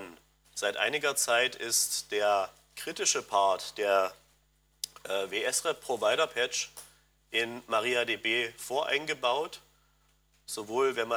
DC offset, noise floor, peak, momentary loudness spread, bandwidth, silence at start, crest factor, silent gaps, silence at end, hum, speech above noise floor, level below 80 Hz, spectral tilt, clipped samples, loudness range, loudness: under 0.1%; -69 dBFS; -12 dBFS; 13 LU; 19.5 kHz; 0 s; 20 dB; none; 0 s; none; 39 dB; -70 dBFS; -0.5 dB/octave; under 0.1%; 3 LU; -29 LUFS